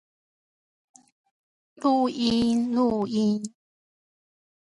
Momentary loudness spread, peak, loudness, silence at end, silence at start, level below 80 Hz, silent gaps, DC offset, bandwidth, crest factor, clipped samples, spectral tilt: 5 LU; -10 dBFS; -24 LUFS; 1.2 s; 1.8 s; -60 dBFS; none; under 0.1%; 11.5 kHz; 18 dB; under 0.1%; -6 dB/octave